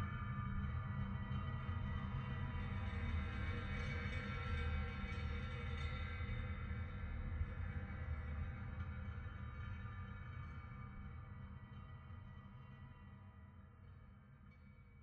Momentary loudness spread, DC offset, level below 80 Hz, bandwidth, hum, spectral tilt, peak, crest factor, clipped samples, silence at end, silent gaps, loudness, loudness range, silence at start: 16 LU; under 0.1%; -50 dBFS; 6.6 kHz; none; -7.5 dB/octave; -30 dBFS; 14 dB; under 0.1%; 0 s; none; -46 LUFS; 12 LU; 0 s